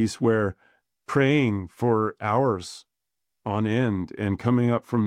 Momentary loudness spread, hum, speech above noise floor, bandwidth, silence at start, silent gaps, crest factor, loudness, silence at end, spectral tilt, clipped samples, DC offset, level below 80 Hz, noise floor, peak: 9 LU; none; 61 dB; 12 kHz; 0 s; none; 16 dB; -24 LUFS; 0 s; -7 dB/octave; under 0.1%; under 0.1%; -58 dBFS; -85 dBFS; -8 dBFS